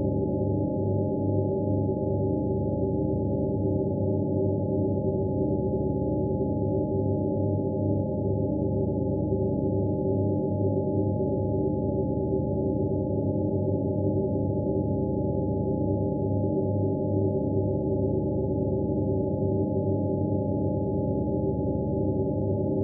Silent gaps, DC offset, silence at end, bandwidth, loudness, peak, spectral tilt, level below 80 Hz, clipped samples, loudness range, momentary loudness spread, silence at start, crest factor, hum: none; under 0.1%; 0 s; 0.9 kHz; -27 LUFS; -14 dBFS; -7 dB/octave; -42 dBFS; under 0.1%; 0 LU; 1 LU; 0 s; 12 dB; none